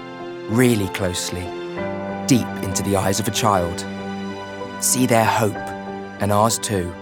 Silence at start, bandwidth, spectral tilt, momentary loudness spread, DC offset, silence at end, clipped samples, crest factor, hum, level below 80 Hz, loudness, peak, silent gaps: 0 s; over 20 kHz; -4.5 dB/octave; 13 LU; under 0.1%; 0 s; under 0.1%; 18 dB; none; -56 dBFS; -21 LUFS; -4 dBFS; none